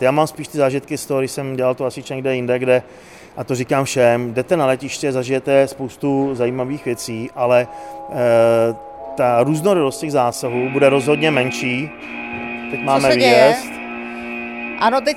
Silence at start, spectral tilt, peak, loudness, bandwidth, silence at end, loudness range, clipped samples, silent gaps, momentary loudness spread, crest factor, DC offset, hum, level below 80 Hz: 0 s; -5 dB/octave; 0 dBFS; -18 LUFS; 16 kHz; 0 s; 3 LU; under 0.1%; none; 13 LU; 18 dB; under 0.1%; none; -56 dBFS